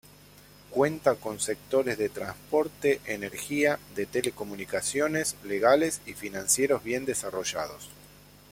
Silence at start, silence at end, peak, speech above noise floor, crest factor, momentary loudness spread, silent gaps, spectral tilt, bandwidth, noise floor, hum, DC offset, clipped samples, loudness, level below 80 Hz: 0.7 s; 0.45 s; -6 dBFS; 25 dB; 24 dB; 10 LU; none; -3 dB/octave; 16.5 kHz; -53 dBFS; 50 Hz at -50 dBFS; under 0.1%; under 0.1%; -28 LUFS; -60 dBFS